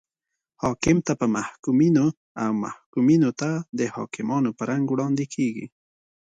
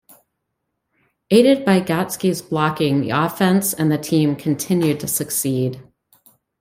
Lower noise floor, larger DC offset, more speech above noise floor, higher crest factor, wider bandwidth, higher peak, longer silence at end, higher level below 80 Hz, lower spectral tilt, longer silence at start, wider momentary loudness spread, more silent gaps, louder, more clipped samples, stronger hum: first, -85 dBFS vs -76 dBFS; neither; first, 62 dB vs 58 dB; about the same, 16 dB vs 18 dB; second, 9.2 kHz vs 16 kHz; second, -8 dBFS vs -2 dBFS; second, 0.6 s vs 0.8 s; about the same, -56 dBFS vs -58 dBFS; about the same, -6.5 dB/octave vs -5.5 dB/octave; second, 0.6 s vs 1.3 s; first, 10 LU vs 7 LU; first, 1.59-1.63 s, 2.17-2.35 s, 2.86-2.93 s, 3.69-3.73 s vs none; second, -24 LUFS vs -18 LUFS; neither; neither